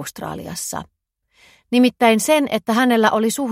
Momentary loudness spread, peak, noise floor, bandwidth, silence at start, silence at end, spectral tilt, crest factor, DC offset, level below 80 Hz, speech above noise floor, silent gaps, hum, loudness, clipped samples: 14 LU; 0 dBFS; -57 dBFS; 16 kHz; 0 s; 0 s; -3.5 dB/octave; 18 dB; under 0.1%; -56 dBFS; 40 dB; none; none; -17 LUFS; under 0.1%